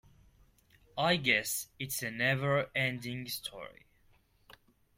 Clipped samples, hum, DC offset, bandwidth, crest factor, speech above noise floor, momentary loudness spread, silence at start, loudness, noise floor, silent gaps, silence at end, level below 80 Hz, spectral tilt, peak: under 0.1%; none; under 0.1%; 16.5 kHz; 24 dB; 34 dB; 15 LU; 0.95 s; -32 LUFS; -67 dBFS; none; 0.45 s; -66 dBFS; -3.5 dB/octave; -12 dBFS